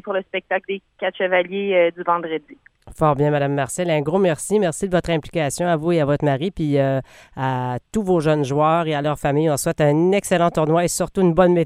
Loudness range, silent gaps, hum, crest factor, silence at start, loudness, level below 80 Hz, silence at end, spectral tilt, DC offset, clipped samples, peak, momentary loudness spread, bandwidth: 3 LU; none; none; 18 dB; 0.05 s; -20 LUFS; -46 dBFS; 0 s; -6 dB/octave; under 0.1%; under 0.1%; -2 dBFS; 7 LU; 15.5 kHz